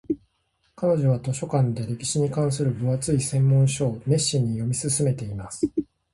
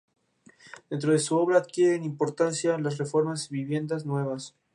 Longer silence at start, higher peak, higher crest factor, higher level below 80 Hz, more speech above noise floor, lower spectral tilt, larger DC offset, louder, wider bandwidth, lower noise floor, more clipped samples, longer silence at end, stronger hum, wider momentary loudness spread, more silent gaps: second, 0.1 s vs 0.65 s; about the same, -8 dBFS vs -10 dBFS; about the same, 16 dB vs 18 dB; first, -52 dBFS vs -76 dBFS; first, 47 dB vs 32 dB; about the same, -6 dB/octave vs -5.5 dB/octave; neither; first, -24 LUFS vs -27 LUFS; about the same, 11.5 kHz vs 11.5 kHz; first, -70 dBFS vs -58 dBFS; neither; about the same, 0.3 s vs 0.25 s; neither; about the same, 8 LU vs 8 LU; neither